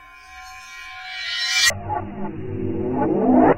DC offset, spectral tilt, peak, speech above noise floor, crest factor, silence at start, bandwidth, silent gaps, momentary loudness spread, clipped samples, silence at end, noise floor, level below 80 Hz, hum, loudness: under 0.1%; -3.5 dB/octave; -4 dBFS; 21 dB; 18 dB; 0 s; 16 kHz; none; 21 LU; under 0.1%; 0 s; -41 dBFS; -46 dBFS; none; -21 LUFS